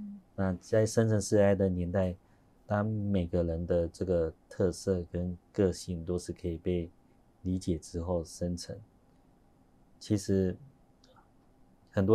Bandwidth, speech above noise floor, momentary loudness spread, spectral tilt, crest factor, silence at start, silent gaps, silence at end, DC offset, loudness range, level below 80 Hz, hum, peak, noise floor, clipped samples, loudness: 13 kHz; 32 dB; 11 LU; -7 dB/octave; 20 dB; 0 s; none; 0 s; under 0.1%; 7 LU; -52 dBFS; none; -12 dBFS; -63 dBFS; under 0.1%; -32 LUFS